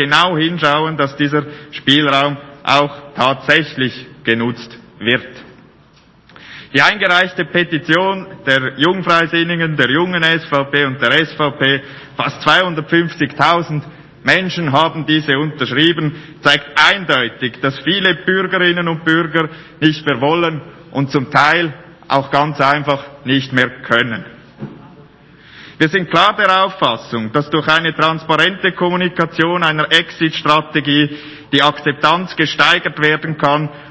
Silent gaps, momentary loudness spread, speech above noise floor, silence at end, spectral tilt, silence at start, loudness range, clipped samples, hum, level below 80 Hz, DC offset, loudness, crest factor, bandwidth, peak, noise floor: none; 9 LU; 33 dB; 0 s; -5.5 dB/octave; 0 s; 3 LU; 0.3%; none; -54 dBFS; under 0.1%; -14 LUFS; 16 dB; 8 kHz; 0 dBFS; -48 dBFS